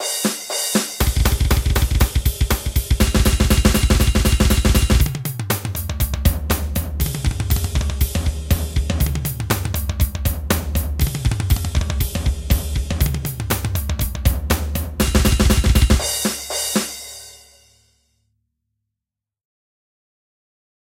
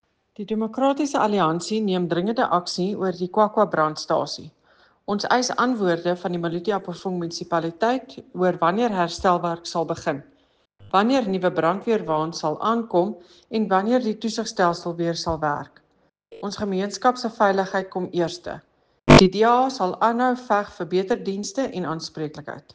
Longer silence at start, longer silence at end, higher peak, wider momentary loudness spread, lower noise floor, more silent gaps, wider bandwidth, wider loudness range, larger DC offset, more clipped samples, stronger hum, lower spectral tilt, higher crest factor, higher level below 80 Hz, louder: second, 0 s vs 0.4 s; first, 3.55 s vs 0.15 s; about the same, -2 dBFS vs 0 dBFS; second, 7 LU vs 10 LU; first, -86 dBFS vs -65 dBFS; neither; first, 17 kHz vs 9.8 kHz; about the same, 4 LU vs 5 LU; neither; neither; neither; about the same, -4.5 dB/octave vs -5.5 dB/octave; about the same, 18 dB vs 22 dB; first, -22 dBFS vs -46 dBFS; about the same, -20 LUFS vs -22 LUFS